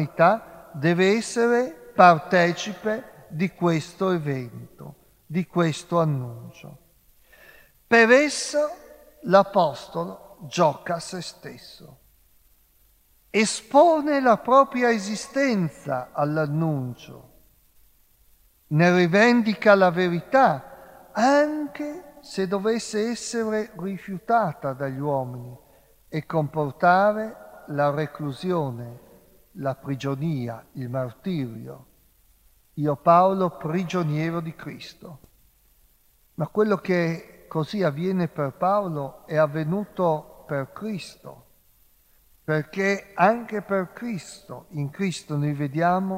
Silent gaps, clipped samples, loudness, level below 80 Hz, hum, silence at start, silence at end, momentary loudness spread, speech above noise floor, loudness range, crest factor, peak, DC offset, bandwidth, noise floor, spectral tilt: none; under 0.1%; -23 LUFS; -62 dBFS; none; 0 s; 0 s; 18 LU; 38 dB; 8 LU; 24 dB; -2 dBFS; under 0.1%; 16 kHz; -61 dBFS; -6 dB/octave